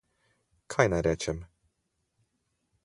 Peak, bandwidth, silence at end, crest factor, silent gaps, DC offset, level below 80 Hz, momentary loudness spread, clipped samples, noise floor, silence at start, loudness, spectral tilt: -6 dBFS; 11.5 kHz; 1.4 s; 28 dB; none; under 0.1%; -50 dBFS; 10 LU; under 0.1%; -79 dBFS; 0.7 s; -28 LUFS; -5 dB/octave